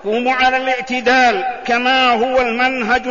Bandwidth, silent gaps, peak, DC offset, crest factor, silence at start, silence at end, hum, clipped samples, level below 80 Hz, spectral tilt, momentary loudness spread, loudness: 7.4 kHz; none; -4 dBFS; 0.6%; 12 dB; 0 s; 0 s; none; under 0.1%; -46 dBFS; -3 dB/octave; 5 LU; -14 LUFS